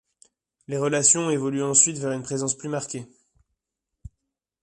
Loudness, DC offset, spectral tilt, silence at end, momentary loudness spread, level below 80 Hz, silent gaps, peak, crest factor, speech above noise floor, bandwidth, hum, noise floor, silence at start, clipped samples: -22 LUFS; under 0.1%; -3.5 dB/octave; 1.6 s; 14 LU; -58 dBFS; none; -4 dBFS; 24 dB; 60 dB; 11.5 kHz; none; -84 dBFS; 0.7 s; under 0.1%